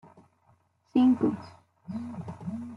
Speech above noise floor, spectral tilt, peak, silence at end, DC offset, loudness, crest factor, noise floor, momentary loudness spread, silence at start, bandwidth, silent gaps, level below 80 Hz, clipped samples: 39 dB; -8.5 dB/octave; -12 dBFS; 0 s; under 0.1%; -28 LUFS; 18 dB; -66 dBFS; 17 LU; 0.05 s; 5.4 kHz; none; -70 dBFS; under 0.1%